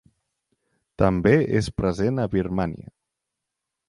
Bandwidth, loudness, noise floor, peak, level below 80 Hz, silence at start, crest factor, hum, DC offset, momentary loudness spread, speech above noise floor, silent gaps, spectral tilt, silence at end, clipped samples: 11.5 kHz; -23 LUFS; -83 dBFS; -4 dBFS; -42 dBFS; 1 s; 20 dB; none; under 0.1%; 9 LU; 62 dB; none; -7.5 dB/octave; 1.05 s; under 0.1%